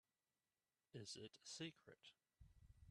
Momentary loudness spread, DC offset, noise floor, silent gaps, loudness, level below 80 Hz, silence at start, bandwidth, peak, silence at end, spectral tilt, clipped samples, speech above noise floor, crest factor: 13 LU; under 0.1%; under -90 dBFS; none; -57 LUFS; -78 dBFS; 0.95 s; 12.5 kHz; -40 dBFS; 0 s; -3.5 dB/octave; under 0.1%; over 32 dB; 22 dB